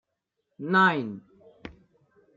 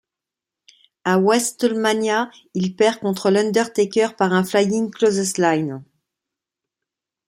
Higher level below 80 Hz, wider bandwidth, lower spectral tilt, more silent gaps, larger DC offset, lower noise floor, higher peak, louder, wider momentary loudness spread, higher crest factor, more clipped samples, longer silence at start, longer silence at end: about the same, -64 dBFS vs -66 dBFS; second, 7.4 kHz vs 16 kHz; first, -7 dB/octave vs -4.5 dB/octave; neither; neither; second, -81 dBFS vs -87 dBFS; second, -8 dBFS vs -4 dBFS; second, -23 LUFS vs -19 LUFS; first, 26 LU vs 8 LU; about the same, 20 dB vs 16 dB; neither; second, 0.6 s vs 1.05 s; second, 0.65 s vs 1.45 s